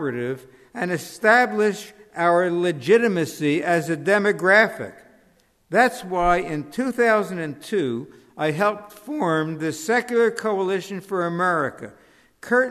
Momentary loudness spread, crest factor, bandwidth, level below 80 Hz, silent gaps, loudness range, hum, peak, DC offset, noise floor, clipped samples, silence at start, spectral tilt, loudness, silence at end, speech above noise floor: 14 LU; 18 dB; 13.5 kHz; -50 dBFS; none; 4 LU; none; -4 dBFS; under 0.1%; -60 dBFS; under 0.1%; 0 s; -5.5 dB/octave; -21 LUFS; 0 s; 39 dB